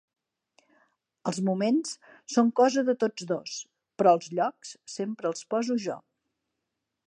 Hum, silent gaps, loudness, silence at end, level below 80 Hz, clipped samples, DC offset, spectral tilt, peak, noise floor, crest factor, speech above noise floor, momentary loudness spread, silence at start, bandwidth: none; none; -27 LUFS; 1.1 s; -82 dBFS; under 0.1%; under 0.1%; -5 dB/octave; -8 dBFS; -84 dBFS; 20 dB; 57 dB; 16 LU; 1.25 s; 10.5 kHz